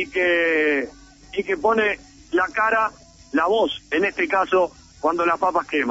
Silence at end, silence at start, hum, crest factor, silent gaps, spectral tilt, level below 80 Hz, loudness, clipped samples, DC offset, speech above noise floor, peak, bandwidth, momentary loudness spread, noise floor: 0 s; 0 s; none; 14 dB; none; -4.5 dB/octave; -54 dBFS; -21 LUFS; under 0.1%; under 0.1%; 21 dB; -8 dBFS; 8 kHz; 8 LU; -42 dBFS